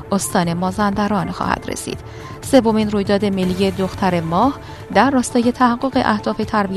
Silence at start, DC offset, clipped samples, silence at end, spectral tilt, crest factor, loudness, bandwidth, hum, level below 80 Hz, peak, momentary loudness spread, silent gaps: 0 s; under 0.1%; under 0.1%; 0 s; -5.5 dB/octave; 18 dB; -18 LUFS; 13.5 kHz; none; -42 dBFS; 0 dBFS; 10 LU; none